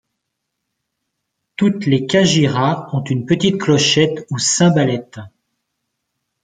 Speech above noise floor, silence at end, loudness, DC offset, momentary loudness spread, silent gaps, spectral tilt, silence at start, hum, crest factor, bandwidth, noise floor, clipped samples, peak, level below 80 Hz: 61 dB; 1.15 s; -15 LUFS; under 0.1%; 8 LU; none; -4.5 dB/octave; 1.6 s; none; 16 dB; 9.6 kHz; -76 dBFS; under 0.1%; 0 dBFS; -54 dBFS